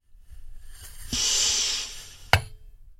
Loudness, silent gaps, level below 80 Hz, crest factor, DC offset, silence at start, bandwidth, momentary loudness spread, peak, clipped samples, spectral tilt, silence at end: -24 LUFS; none; -42 dBFS; 28 dB; under 0.1%; 0.15 s; 16.5 kHz; 25 LU; -2 dBFS; under 0.1%; -1 dB/octave; 0.05 s